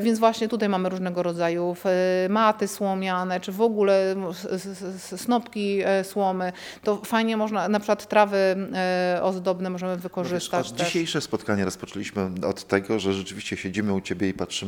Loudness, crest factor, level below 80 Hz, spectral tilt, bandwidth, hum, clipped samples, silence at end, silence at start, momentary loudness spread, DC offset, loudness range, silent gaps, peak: -25 LUFS; 20 dB; -64 dBFS; -5 dB/octave; 18.5 kHz; none; under 0.1%; 0 s; 0 s; 9 LU; under 0.1%; 3 LU; none; -4 dBFS